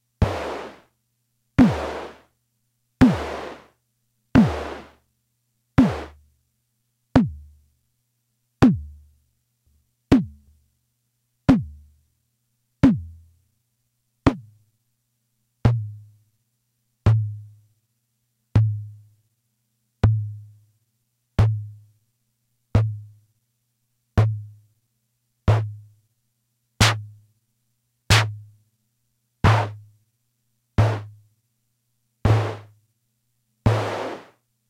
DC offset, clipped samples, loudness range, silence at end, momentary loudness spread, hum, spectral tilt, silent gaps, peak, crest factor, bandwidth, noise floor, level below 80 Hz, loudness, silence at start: under 0.1%; under 0.1%; 4 LU; 0.5 s; 20 LU; 60 Hz at -50 dBFS; -6.5 dB/octave; none; 0 dBFS; 24 dB; 13.5 kHz; -73 dBFS; -40 dBFS; -22 LUFS; 0.2 s